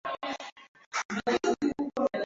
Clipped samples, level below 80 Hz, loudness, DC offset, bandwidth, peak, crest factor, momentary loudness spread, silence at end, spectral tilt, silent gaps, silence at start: under 0.1%; -66 dBFS; -31 LUFS; under 0.1%; 7.8 kHz; -14 dBFS; 18 dB; 10 LU; 0 s; -4 dB/octave; 0.52-0.56 s, 0.68-0.75 s, 0.86-0.91 s, 1.05-1.09 s; 0.05 s